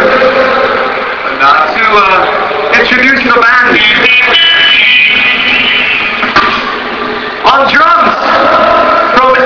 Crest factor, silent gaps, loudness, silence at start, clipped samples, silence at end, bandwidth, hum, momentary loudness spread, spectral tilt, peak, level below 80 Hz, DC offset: 6 dB; none; -6 LUFS; 0 s; 5%; 0 s; 5.4 kHz; none; 8 LU; -3.5 dB/octave; 0 dBFS; -38 dBFS; under 0.1%